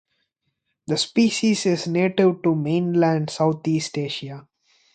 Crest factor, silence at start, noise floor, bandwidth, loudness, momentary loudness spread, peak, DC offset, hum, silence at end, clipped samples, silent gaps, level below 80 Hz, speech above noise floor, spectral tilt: 18 dB; 0.9 s; -75 dBFS; 9.4 kHz; -21 LUFS; 10 LU; -6 dBFS; under 0.1%; none; 0.55 s; under 0.1%; none; -64 dBFS; 55 dB; -5.5 dB/octave